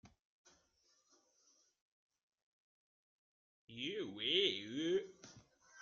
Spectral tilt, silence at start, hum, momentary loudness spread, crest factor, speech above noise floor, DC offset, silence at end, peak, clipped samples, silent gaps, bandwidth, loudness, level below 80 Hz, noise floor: -1.5 dB/octave; 0.05 s; none; 16 LU; 24 dB; 39 dB; under 0.1%; 0 s; -22 dBFS; under 0.1%; 0.25-0.45 s, 1.81-2.10 s, 2.23-2.28 s, 2.42-3.68 s; 7.4 kHz; -38 LUFS; -84 dBFS; -77 dBFS